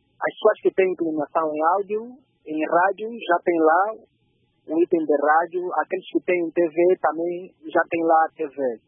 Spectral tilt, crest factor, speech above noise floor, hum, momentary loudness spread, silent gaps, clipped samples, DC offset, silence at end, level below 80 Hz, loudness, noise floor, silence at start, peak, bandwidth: -10 dB/octave; 16 dB; 45 dB; none; 10 LU; none; under 0.1%; under 0.1%; 0.1 s; -78 dBFS; -22 LUFS; -66 dBFS; 0.2 s; -6 dBFS; 3.6 kHz